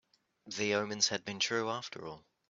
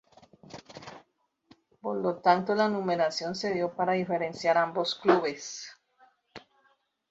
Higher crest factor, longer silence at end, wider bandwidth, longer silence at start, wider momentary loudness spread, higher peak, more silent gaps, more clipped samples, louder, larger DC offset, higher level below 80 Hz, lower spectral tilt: about the same, 22 dB vs 22 dB; second, 0.3 s vs 0.7 s; about the same, 8 kHz vs 8 kHz; about the same, 0.45 s vs 0.55 s; second, 14 LU vs 21 LU; second, -14 dBFS vs -8 dBFS; neither; neither; second, -33 LUFS vs -28 LUFS; neither; about the same, -78 dBFS vs -74 dBFS; second, -2 dB/octave vs -4.5 dB/octave